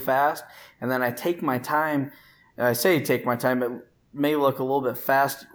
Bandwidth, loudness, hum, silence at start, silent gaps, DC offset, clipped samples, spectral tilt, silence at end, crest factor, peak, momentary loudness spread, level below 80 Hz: 20 kHz; -24 LUFS; none; 0 s; none; under 0.1%; under 0.1%; -5 dB/octave; 0.1 s; 16 dB; -8 dBFS; 10 LU; -70 dBFS